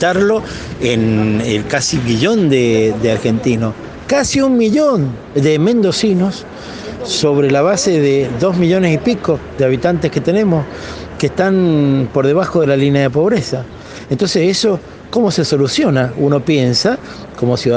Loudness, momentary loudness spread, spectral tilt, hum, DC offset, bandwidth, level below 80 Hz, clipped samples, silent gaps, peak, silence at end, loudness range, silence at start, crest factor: -14 LUFS; 10 LU; -5.5 dB/octave; none; under 0.1%; 10 kHz; -42 dBFS; under 0.1%; none; 0 dBFS; 0 s; 1 LU; 0 s; 14 dB